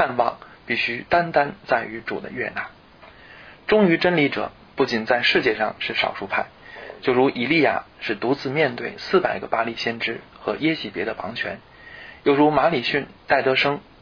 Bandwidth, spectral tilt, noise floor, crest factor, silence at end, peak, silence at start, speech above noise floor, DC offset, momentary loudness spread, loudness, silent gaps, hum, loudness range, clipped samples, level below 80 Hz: 5.4 kHz; -6 dB/octave; -47 dBFS; 18 dB; 0.2 s; -4 dBFS; 0 s; 26 dB; under 0.1%; 13 LU; -22 LUFS; none; none; 4 LU; under 0.1%; -56 dBFS